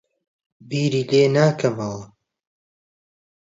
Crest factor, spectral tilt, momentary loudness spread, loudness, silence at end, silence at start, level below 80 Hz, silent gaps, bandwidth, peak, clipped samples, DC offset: 20 dB; -6.5 dB/octave; 13 LU; -20 LUFS; 1.55 s; 0.65 s; -62 dBFS; none; 7.8 kHz; -4 dBFS; under 0.1%; under 0.1%